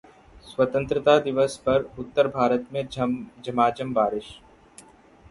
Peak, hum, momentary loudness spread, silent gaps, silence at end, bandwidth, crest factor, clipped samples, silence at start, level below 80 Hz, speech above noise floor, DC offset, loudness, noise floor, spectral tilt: -4 dBFS; none; 11 LU; none; 0.95 s; 11.5 kHz; 20 dB; under 0.1%; 0.35 s; -54 dBFS; 29 dB; under 0.1%; -24 LUFS; -52 dBFS; -6 dB/octave